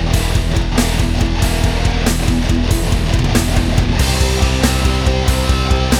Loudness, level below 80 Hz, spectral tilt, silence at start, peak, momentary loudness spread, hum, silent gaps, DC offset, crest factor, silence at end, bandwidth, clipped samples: -16 LUFS; -18 dBFS; -5 dB/octave; 0 s; 0 dBFS; 2 LU; none; none; under 0.1%; 14 dB; 0 s; 17 kHz; under 0.1%